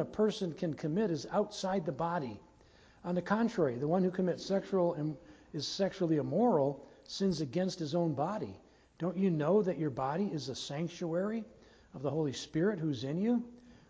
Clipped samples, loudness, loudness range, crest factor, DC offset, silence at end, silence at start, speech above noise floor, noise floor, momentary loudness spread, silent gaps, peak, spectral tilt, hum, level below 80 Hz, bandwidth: under 0.1%; -34 LUFS; 3 LU; 18 dB; under 0.1%; 0.15 s; 0 s; 29 dB; -62 dBFS; 11 LU; none; -16 dBFS; -6.5 dB/octave; none; -66 dBFS; 8 kHz